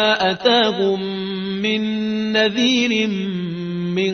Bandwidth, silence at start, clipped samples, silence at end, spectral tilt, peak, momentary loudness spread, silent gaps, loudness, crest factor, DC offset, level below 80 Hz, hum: 6.6 kHz; 0 s; under 0.1%; 0 s; -5 dB/octave; -2 dBFS; 9 LU; none; -19 LUFS; 16 dB; under 0.1%; -58 dBFS; none